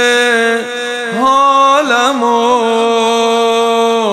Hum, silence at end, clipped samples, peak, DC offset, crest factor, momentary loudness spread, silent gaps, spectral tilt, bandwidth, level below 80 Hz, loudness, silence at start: none; 0 s; under 0.1%; 0 dBFS; under 0.1%; 10 dB; 6 LU; none; -2 dB/octave; 14 kHz; -58 dBFS; -11 LUFS; 0 s